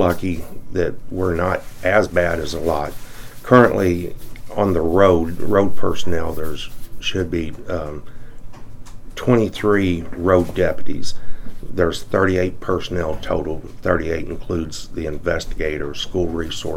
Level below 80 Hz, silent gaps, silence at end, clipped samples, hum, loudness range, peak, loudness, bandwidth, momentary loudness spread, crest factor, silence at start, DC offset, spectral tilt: -34 dBFS; none; 0 s; under 0.1%; none; 6 LU; 0 dBFS; -20 LUFS; 16.5 kHz; 15 LU; 18 dB; 0 s; under 0.1%; -6 dB/octave